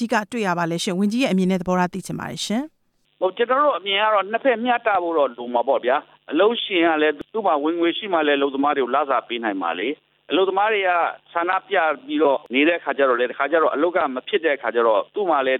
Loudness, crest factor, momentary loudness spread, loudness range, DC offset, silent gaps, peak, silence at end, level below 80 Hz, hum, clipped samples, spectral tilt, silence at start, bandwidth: -21 LUFS; 16 dB; 6 LU; 2 LU; under 0.1%; none; -6 dBFS; 0 s; -62 dBFS; none; under 0.1%; -5 dB/octave; 0 s; 15 kHz